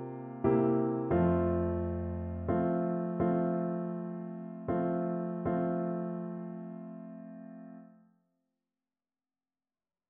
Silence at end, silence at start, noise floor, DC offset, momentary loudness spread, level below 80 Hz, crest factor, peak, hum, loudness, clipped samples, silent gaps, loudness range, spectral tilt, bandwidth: 2.25 s; 0 s; under -90 dBFS; under 0.1%; 18 LU; -54 dBFS; 18 dB; -16 dBFS; none; -33 LUFS; under 0.1%; none; 16 LU; -10.5 dB/octave; 3.4 kHz